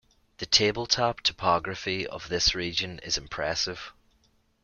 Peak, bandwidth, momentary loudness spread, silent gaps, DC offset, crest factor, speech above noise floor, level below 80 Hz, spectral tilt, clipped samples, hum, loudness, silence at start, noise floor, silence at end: -6 dBFS; 12 kHz; 10 LU; none; under 0.1%; 24 dB; 39 dB; -48 dBFS; -2.5 dB/octave; under 0.1%; none; -26 LUFS; 0.4 s; -67 dBFS; 0.75 s